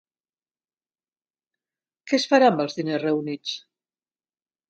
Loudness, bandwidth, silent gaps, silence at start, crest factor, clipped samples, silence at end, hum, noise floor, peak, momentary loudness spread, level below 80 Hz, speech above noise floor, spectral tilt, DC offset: -22 LUFS; 9 kHz; none; 2.05 s; 22 dB; under 0.1%; 1.1 s; none; under -90 dBFS; -4 dBFS; 14 LU; -78 dBFS; over 68 dB; -5 dB/octave; under 0.1%